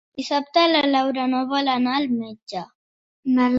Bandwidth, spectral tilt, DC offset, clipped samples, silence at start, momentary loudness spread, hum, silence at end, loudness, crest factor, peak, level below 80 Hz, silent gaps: 7.8 kHz; -4.5 dB/octave; under 0.1%; under 0.1%; 0.15 s; 15 LU; none; 0 s; -21 LUFS; 18 dB; -4 dBFS; -66 dBFS; 2.43-2.47 s, 2.75-3.23 s